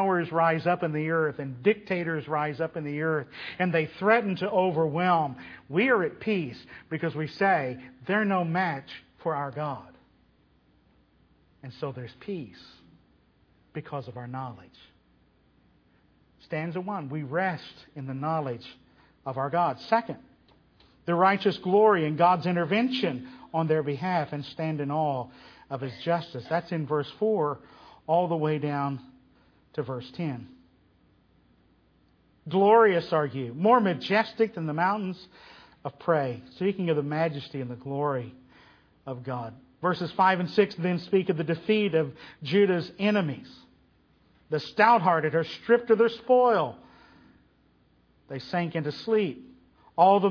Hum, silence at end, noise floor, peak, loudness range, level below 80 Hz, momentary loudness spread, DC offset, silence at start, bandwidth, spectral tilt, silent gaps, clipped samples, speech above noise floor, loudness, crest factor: none; 0 s; -64 dBFS; -6 dBFS; 15 LU; -68 dBFS; 16 LU; under 0.1%; 0 s; 5.4 kHz; -8 dB/octave; none; under 0.1%; 37 dB; -27 LUFS; 22 dB